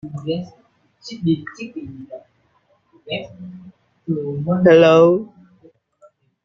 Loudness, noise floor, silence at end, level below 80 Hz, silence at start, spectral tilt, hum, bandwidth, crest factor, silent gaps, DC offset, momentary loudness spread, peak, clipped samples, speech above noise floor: -17 LUFS; -61 dBFS; 1.2 s; -58 dBFS; 0.05 s; -7.5 dB/octave; none; 7.2 kHz; 18 dB; none; under 0.1%; 27 LU; -2 dBFS; under 0.1%; 44 dB